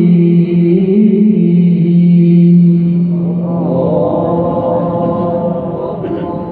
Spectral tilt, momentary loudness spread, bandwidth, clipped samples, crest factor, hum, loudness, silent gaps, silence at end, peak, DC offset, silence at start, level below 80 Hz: -13.5 dB/octave; 10 LU; 3.3 kHz; under 0.1%; 10 dB; none; -11 LUFS; none; 0 s; 0 dBFS; under 0.1%; 0 s; -44 dBFS